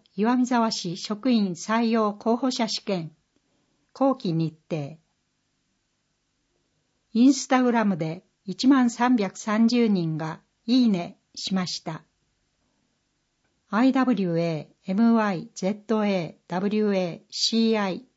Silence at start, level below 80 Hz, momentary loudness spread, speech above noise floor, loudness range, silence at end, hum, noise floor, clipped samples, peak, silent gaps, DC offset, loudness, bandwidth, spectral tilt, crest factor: 0.15 s; -74 dBFS; 12 LU; 51 dB; 7 LU; 0.15 s; none; -74 dBFS; under 0.1%; -8 dBFS; none; under 0.1%; -24 LUFS; 8 kHz; -5.5 dB/octave; 18 dB